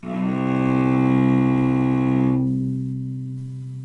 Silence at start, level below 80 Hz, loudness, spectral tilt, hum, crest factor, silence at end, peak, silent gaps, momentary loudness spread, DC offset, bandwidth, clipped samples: 0.05 s; -48 dBFS; -20 LUFS; -9.5 dB/octave; none; 12 dB; 0 s; -8 dBFS; none; 12 LU; under 0.1%; 6 kHz; under 0.1%